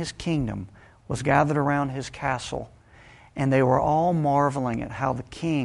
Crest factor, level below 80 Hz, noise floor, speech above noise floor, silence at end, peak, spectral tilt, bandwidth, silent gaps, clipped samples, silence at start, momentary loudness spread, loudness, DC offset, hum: 20 dB; -48 dBFS; -51 dBFS; 27 dB; 0 s; -6 dBFS; -6.5 dB/octave; 11.5 kHz; none; under 0.1%; 0 s; 13 LU; -25 LUFS; under 0.1%; none